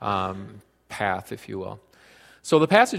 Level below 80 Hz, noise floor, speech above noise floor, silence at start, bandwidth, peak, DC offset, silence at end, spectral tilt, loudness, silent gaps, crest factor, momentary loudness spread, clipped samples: -62 dBFS; -53 dBFS; 30 dB; 0 s; 15 kHz; -2 dBFS; under 0.1%; 0 s; -5 dB/octave; -24 LUFS; none; 24 dB; 21 LU; under 0.1%